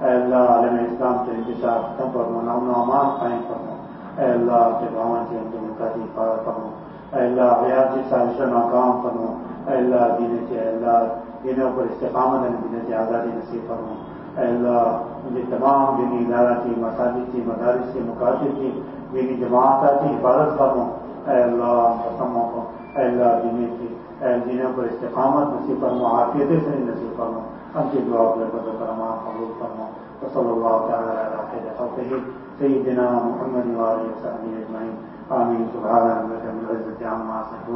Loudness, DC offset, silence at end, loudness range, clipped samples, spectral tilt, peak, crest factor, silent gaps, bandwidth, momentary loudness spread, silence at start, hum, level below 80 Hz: -21 LUFS; under 0.1%; 0 s; 4 LU; under 0.1%; -12 dB/octave; -4 dBFS; 18 dB; none; 5.8 kHz; 12 LU; 0 s; none; -54 dBFS